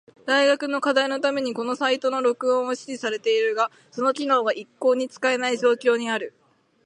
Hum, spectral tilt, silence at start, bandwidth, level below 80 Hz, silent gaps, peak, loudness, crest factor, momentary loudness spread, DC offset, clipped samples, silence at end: none; -2.5 dB/octave; 0.25 s; 11 kHz; -80 dBFS; none; -6 dBFS; -23 LUFS; 16 dB; 7 LU; under 0.1%; under 0.1%; 0.55 s